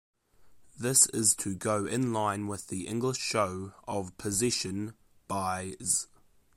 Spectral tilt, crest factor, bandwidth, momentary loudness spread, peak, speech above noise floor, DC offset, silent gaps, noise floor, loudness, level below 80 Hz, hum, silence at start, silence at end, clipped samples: -3 dB/octave; 24 dB; 16 kHz; 14 LU; -8 dBFS; 29 dB; under 0.1%; none; -59 dBFS; -29 LUFS; -64 dBFS; none; 0.4 s; 0.5 s; under 0.1%